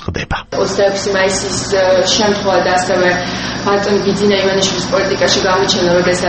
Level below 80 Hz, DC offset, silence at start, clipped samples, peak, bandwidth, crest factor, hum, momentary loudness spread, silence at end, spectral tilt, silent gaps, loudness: -36 dBFS; under 0.1%; 0 s; under 0.1%; 0 dBFS; 8.8 kHz; 14 dB; none; 6 LU; 0 s; -3.5 dB/octave; none; -13 LUFS